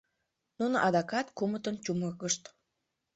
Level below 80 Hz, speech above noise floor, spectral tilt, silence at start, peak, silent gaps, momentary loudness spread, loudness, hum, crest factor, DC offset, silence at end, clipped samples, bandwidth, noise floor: -72 dBFS; 52 dB; -4 dB/octave; 0.6 s; -14 dBFS; none; 7 LU; -32 LUFS; none; 20 dB; under 0.1%; 0.65 s; under 0.1%; 8.4 kHz; -84 dBFS